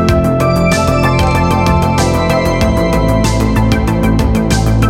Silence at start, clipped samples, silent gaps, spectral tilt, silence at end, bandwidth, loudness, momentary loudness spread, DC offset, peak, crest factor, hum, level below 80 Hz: 0 s; under 0.1%; none; -6 dB/octave; 0 s; 17 kHz; -12 LUFS; 1 LU; under 0.1%; 0 dBFS; 10 dB; none; -18 dBFS